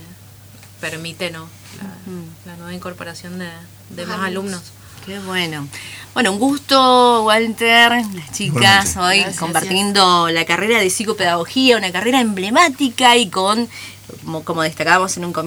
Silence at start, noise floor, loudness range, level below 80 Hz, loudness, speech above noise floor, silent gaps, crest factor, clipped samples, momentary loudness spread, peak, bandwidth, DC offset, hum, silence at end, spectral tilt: 0 s; -41 dBFS; 16 LU; -52 dBFS; -15 LUFS; 24 dB; none; 18 dB; under 0.1%; 21 LU; 0 dBFS; over 20 kHz; under 0.1%; none; 0 s; -3 dB/octave